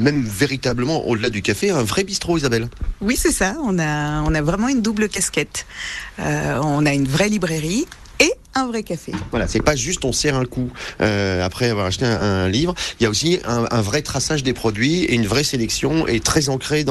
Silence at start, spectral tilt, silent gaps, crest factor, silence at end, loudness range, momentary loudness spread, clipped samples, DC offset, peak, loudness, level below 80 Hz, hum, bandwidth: 0 s; -4.5 dB/octave; none; 16 dB; 0 s; 2 LU; 6 LU; under 0.1%; under 0.1%; -2 dBFS; -19 LUFS; -36 dBFS; none; 13 kHz